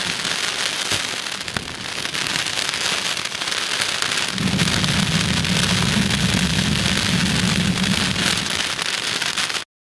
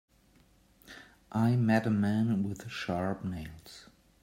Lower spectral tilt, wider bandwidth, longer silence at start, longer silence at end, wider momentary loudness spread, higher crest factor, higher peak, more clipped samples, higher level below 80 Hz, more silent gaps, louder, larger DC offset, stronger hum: second, -3 dB/octave vs -7.5 dB/octave; second, 12 kHz vs 16 kHz; second, 0 s vs 0.9 s; about the same, 0.35 s vs 0.4 s; second, 5 LU vs 24 LU; about the same, 22 dB vs 20 dB; first, 0 dBFS vs -12 dBFS; neither; first, -40 dBFS vs -62 dBFS; neither; first, -19 LUFS vs -31 LUFS; neither; neither